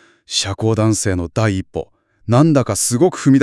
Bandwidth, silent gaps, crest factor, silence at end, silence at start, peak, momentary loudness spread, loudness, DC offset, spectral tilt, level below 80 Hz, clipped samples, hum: 12 kHz; none; 16 dB; 0 s; 0.3 s; 0 dBFS; 15 LU; -16 LUFS; under 0.1%; -5 dB/octave; -48 dBFS; under 0.1%; none